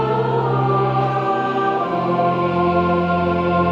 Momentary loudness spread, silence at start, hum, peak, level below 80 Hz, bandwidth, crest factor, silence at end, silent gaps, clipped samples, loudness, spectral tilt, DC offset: 2 LU; 0 s; none; -6 dBFS; -46 dBFS; 7 kHz; 12 dB; 0 s; none; under 0.1%; -18 LUFS; -9 dB/octave; under 0.1%